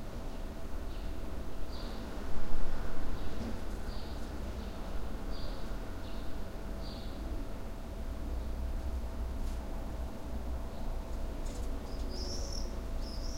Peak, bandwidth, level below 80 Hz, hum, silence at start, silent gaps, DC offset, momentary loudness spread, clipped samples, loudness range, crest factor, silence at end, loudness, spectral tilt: -14 dBFS; 15 kHz; -38 dBFS; none; 0 s; none; under 0.1%; 4 LU; under 0.1%; 2 LU; 18 dB; 0 s; -42 LUFS; -5.5 dB/octave